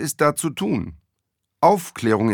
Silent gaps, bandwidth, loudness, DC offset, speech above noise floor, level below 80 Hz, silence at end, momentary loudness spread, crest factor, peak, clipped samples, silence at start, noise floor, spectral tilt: none; 19 kHz; -21 LUFS; under 0.1%; 58 dB; -54 dBFS; 0 s; 8 LU; 18 dB; -2 dBFS; under 0.1%; 0 s; -78 dBFS; -5 dB/octave